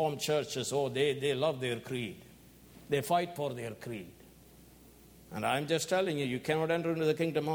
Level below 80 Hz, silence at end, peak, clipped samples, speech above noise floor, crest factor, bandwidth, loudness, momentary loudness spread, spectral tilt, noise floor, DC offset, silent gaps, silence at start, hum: -66 dBFS; 0 s; -16 dBFS; under 0.1%; 25 dB; 18 dB; 19.5 kHz; -33 LUFS; 12 LU; -4.5 dB/octave; -57 dBFS; under 0.1%; none; 0 s; none